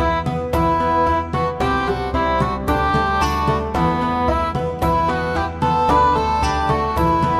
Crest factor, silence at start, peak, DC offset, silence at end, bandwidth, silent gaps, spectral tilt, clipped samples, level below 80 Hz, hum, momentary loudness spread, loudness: 14 dB; 0 s; -4 dBFS; under 0.1%; 0 s; 15.5 kHz; none; -6.5 dB/octave; under 0.1%; -30 dBFS; none; 5 LU; -18 LUFS